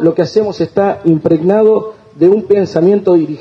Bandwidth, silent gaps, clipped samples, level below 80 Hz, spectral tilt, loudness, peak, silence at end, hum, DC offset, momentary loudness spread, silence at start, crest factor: 7 kHz; none; under 0.1%; -52 dBFS; -8.5 dB/octave; -12 LUFS; 0 dBFS; 0 s; none; under 0.1%; 5 LU; 0 s; 10 dB